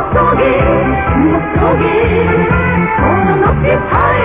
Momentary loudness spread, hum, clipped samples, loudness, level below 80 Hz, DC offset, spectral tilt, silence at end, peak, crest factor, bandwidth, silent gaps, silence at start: 2 LU; none; under 0.1%; -11 LUFS; -22 dBFS; under 0.1%; -11 dB/octave; 0 s; 0 dBFS; 10 dB; 3.8 kHz; none; 0 s